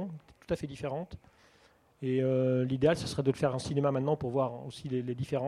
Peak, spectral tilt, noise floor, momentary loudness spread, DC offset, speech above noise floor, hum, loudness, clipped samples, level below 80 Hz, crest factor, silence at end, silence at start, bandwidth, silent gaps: -12 dBFS; -7 dB/octave; -64 dBFS; 13 LU; under 0.1%; 33 dB; none; -32 LUFS; under 0.1%; -58 dBFS; 20 dB; 0 s; 0 s; 12 kHz; none